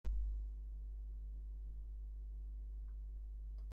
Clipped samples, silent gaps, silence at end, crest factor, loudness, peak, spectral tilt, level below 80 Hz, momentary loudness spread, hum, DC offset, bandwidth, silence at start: under 0.1%; none; 0 s; 14 dB; -50 LUFS; -30 dBFS; -9.5 dB/octave; -46 dBFS; 6 LU; none; under 0.1%; 1.5 kHz; 0.05 s